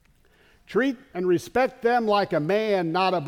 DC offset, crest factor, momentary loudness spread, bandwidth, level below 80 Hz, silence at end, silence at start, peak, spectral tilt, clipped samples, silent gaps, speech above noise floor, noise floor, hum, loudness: under 0.1%; 14 dB; 4 LU; 16 kHz; -60 dBFS; 0 s; 0.7 s; -10 dBFS; -6 dB/octave; under 0.1%; none; 36 dB; -59 dBFS; none; -24 LUFS